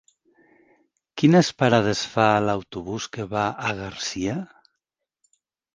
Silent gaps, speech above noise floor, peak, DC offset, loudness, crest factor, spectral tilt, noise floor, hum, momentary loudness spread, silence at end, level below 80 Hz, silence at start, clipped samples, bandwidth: none; 61 dB; -2 dBFS; under 0.1%; -23 LUFS; 22 dB; -5.5 dB/octave; -83 dBFS; none; 14 LU; 1.3 s; -56 dBFS; 1.15 s; under 0.1%; 10 kHz